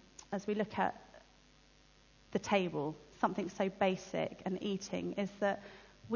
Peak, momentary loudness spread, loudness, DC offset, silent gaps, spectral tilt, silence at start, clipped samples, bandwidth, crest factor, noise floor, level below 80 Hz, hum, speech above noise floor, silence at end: -16 dBFS; 10 LU; -37 LUFS; under 0.1%; none; -5.5 dB/octave; 0.2 s; under 0.1%; 7.2 kHz; 22 dB; -65 dBFS; -68 dBFS; none; 28 dB; 0 s